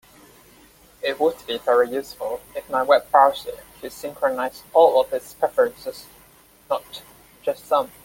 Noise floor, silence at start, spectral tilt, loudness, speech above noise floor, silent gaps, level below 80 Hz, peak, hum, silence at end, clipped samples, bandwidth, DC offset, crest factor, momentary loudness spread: -52 dBFS; 1.05 s; -3 dB/octave; -21 LUFS; 31 dB; none; -60 dBFS; -2 dBFS; none; 0.15 s; under 0.1%; 17 kHz; under 0.1%; 20 dB; 18 LU